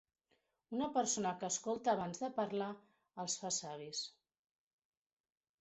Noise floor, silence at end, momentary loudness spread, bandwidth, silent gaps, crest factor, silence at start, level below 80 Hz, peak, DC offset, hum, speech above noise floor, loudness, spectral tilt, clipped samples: -81 dBFS; 1.5 s; 10 LU; 8.2 kHz; none; 20 dB; 0.7 s; -80 dBFS; -22 dBFS; under 0.1%; none; 42 dB; -39 LUFS; -3 dB/octave; under 0.1%